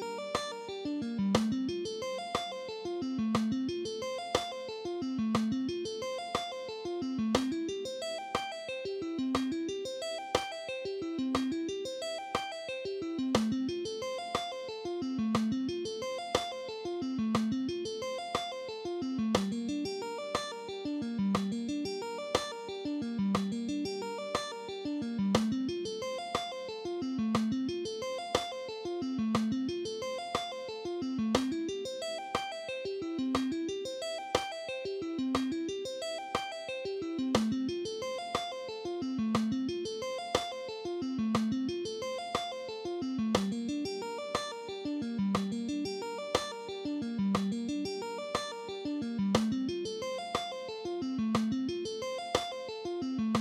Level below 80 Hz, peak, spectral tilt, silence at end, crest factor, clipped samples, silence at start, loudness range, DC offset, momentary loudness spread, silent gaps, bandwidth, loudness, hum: -62 dBFS; -10 dBFS; -5 dB/octave; 0 s; 24 dB; under 0.1%; 0 s; 1 LU; under 0.1%; 7 LU; none; 15 kHz; -35 LUFS; none